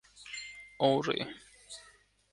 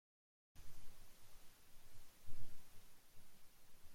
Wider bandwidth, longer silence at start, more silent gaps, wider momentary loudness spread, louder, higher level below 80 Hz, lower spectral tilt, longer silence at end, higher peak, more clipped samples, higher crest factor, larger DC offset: second, 11.5 kHz vs 16.5 kHz; second, 0.15 s vs 0.55 s; neither; first, 20 LU vs 6 LU; first, -33 LUFS vs -66 LUFS; second, -70 dBFS vs -62 dBFS; about the same, -4.5 dB/octave vs -3.5 dB/octave; first, 0.5 s vs 0 s; first, -14 dBFS vs -28 dBFS; neither; first, 22 dB vs 14 dB; neither